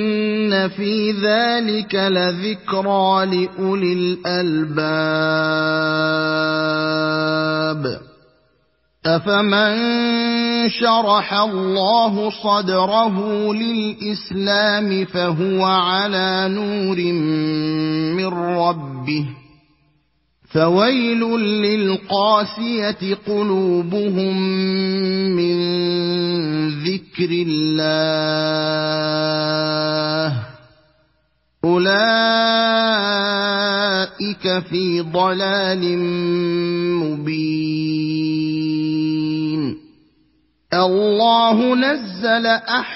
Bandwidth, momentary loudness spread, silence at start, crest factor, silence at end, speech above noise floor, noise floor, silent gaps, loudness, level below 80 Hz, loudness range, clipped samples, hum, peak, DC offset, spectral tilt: 6 kHz; 6 LU; 0 s; 16 dB; 0 s; 47 dB; -64 dBFS; none; -18 LUFS; -60 dBFS; 4 LU; under 0.1%; none; -2 dBFS; under 0.1%; -8.5 dB/octave